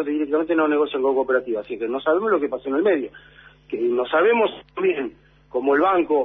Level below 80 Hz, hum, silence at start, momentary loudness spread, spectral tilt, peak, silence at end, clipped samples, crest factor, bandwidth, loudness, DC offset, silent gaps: -60 dBFS; none; 0 s; 9 LU; -8 dB/octave; -8 dBFS; 0 s; under 0.1%; 14 dB; 3.9 kHz; -21 LUFS; under 0.1%; none